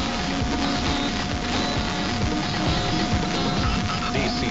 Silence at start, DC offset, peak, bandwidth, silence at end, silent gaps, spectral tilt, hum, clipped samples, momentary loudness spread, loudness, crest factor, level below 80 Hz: 0 s; under 0.1%; -10 dBFS; 8 kHz; 0 s; none; -3.5 dB/octave; none; under 0.1%; 2 LU; -24 LUFS; 14 dB; -32 dBFS